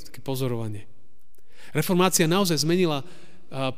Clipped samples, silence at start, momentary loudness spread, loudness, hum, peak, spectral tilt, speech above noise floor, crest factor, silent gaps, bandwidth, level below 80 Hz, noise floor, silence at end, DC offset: under 0.1%; 0 s; 14 LU; -24 LUFS; none; -6 dBFS; -4.5 dB/octave; 37 dB; 20 dB; none; 16 kHz; -60 dBFS; -61 dBFS; 0.05 s; 2%